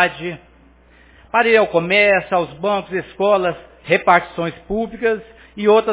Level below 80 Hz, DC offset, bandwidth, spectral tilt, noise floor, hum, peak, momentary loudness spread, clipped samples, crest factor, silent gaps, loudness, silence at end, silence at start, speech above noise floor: -50 dBFS; under 0.1%; 4 kHz; -8.5 dB/octave; -49 dBFS; none; 0 dBFS; 13 LU; under 0.1%; 18 dB; none; -17 LUFS; 0 s; 0 s; 32 dB